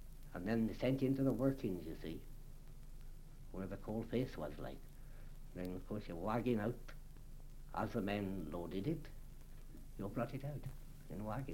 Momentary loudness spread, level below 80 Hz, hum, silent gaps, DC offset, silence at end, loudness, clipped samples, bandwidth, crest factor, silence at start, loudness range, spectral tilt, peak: 22 LU; -52 dBFS; none; none; under 0.1%; 0 s; -42 LUFS; under 0.1%; 16.5 kHz; 20 dB; 0 s; 6 LU; -7.5 dB/octave; -22 dBFS